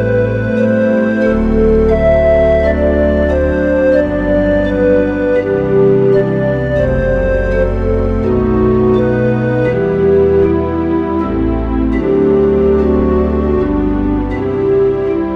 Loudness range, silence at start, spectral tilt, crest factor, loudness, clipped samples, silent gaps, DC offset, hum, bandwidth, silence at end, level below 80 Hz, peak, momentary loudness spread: 2 LU; 0 s; -9.5 dB/octave; 12 dB; -12 LUFS; under 0.1%; none; under 0.1%; none; 6.2 kHz; 0 s; -22 dBFS; 0 dBFS; 5 LU